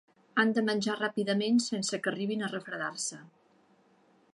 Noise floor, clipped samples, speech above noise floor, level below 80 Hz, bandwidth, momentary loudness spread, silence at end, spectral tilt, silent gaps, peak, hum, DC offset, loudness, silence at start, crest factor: -65 dBFS; under 0.1%; 35 dB; -82 dBFS; 11.5 kHz; 9 LU; 1.1 s; -4 dB/octave; none; -12 dBFS; none; under 0.1%; -31 LUFS; 0.35 s; 20 dB